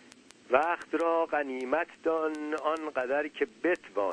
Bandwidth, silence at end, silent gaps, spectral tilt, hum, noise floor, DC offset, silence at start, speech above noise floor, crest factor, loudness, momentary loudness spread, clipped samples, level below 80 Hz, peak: 10.5 kHz; 0 s; none; -4.5 dB/octave; none; -56 dBFS; under 0.1%; 0.5 s; 26 dB; 22 dB; -30 LUFS; 5 LU; under 0.1%; -72 dBFS; -10 dBFS